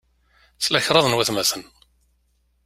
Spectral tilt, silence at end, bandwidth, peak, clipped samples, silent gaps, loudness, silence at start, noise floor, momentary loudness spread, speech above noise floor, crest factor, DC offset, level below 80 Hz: -2.5 dB/octave; 1.05 s; 16 kHz; 0 dBFS; under 0.1%; none; -19 LUFS; 0.6 s; -66 dBFS; 8 LU; 45 dB; 22 dB; under 0.1%; -58 dBFS